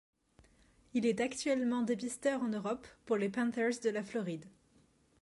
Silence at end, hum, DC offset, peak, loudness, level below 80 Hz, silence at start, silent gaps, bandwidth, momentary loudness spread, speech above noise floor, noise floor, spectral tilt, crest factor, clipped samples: 0.75 s; none; under 0.1%; -20 dBFS; -35 LUFS; -72 dBFS; 0.95 s; none; 11.5 kHz; 7 LU; 34 dB; -69 dBFS; -5 dB/octave; 16 dB; under 0.1%